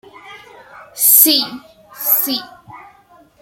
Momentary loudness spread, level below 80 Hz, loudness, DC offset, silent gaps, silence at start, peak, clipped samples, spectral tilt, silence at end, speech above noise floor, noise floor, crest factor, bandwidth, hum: 17 LU; -66 dBFS; -12 LUFS; under 0.1%; none; 0.25 s; 0 dBFS; under 0.1%; 0 dB/octave; 0.6 s; 35 dB; -48 dBFS; 18 dB; over 20 kHz; none